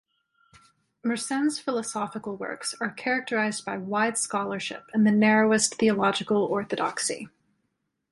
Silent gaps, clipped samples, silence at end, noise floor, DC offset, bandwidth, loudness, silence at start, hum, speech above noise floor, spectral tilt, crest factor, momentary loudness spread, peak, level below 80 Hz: none; under 0.1%; 0.85 s; -78 dBFS; under 0.1%; 11.5 kHz; -26 LUFS; 1.05 s; none; 52 dB; -4 dB/octave; 18 dB; 12 LU; -10 dBFS; -68 dBFS